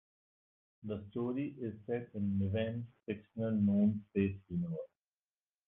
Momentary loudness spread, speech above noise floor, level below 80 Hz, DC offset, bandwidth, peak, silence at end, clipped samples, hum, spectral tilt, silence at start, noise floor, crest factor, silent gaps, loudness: 13 LU; over 54 dB; -60 dBFS; under 0.1%; 3.7 kHz; -20 dBFS; 0.8 s; under 0.1%; none; -11.5 dB/octave; 0.85 s; under -90 dBFS; 18 dB; none; -37 LUFS